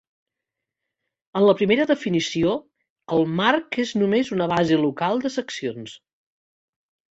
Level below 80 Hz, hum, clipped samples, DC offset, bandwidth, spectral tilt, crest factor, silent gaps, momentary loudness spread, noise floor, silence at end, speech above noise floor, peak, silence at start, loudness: -60 dBFS; none; under 0.1%; under 0.1%; 8 kHz; -5.5 dB/octave; 18 dB; 2.90-2.96 s; 11 LU; -85 dBFS; 1.15 s; 64 dB; -4 dBFS; 1.35 s; -22 LUFS